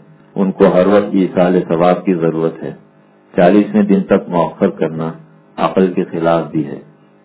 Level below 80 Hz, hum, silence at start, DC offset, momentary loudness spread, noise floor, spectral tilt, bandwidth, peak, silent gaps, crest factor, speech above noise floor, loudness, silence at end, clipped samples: -50 dBFS; none; 0.35 s; under 0.1%; 14 LU; -45 dBFS; -12 dB/octave; 4 kHz; 0 dBFS; none; 14 dB; 32 dB; -14 LUFS; 0.4 s; 0.2%